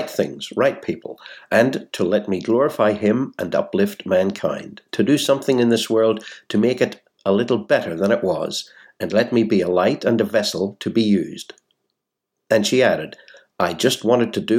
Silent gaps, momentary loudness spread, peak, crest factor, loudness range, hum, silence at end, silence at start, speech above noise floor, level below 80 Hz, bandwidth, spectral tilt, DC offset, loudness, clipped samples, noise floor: none; 11 LU; -2 dBFS; 18 dB; 2 LU; none; 0 s; 0 s; 61 dB; -64 dBFS; 17 kHz; -5 dB/octave; under 0.1%; -20 LUFS; under 0.1%; -80 dBFS